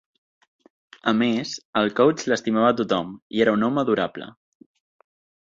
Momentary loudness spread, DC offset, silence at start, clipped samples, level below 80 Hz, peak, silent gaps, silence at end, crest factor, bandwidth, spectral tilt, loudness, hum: 9 LU; under 0.1%; 1.05 s; under 0.1%; -64 dBFS; -4 dBFS; 1.65-1.73 s, 3.22-3.30 s; 1.2 s; 18 dB; 7.6 kHz; -5 dB/octave; -22 LUFS; none